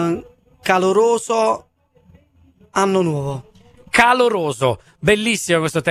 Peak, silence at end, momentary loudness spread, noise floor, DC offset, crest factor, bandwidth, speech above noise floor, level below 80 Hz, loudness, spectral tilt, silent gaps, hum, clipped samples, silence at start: 0 dBFS; 0 s; 12 LU; -53 dBFS; under 0.1%; 18 dB; 14.5 kHz; 36 dB; -50 dBFS; -17 LUFS; -4.5 dB/octave; none; none; under 0.1%; 0 s